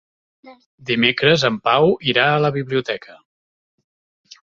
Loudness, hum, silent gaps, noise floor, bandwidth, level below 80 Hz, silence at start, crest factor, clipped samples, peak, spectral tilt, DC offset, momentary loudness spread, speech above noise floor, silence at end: -17 LUFS; none; 0.66-0.78 s; under -90 dBFS; 7.6 kHz; -58 dBFS; 0.45 s; 20 dB; under 0.1%; 0 dBFS; -5.5 dB/octave; under 0.1%; 11 LU; over 72 dB; 1.35 s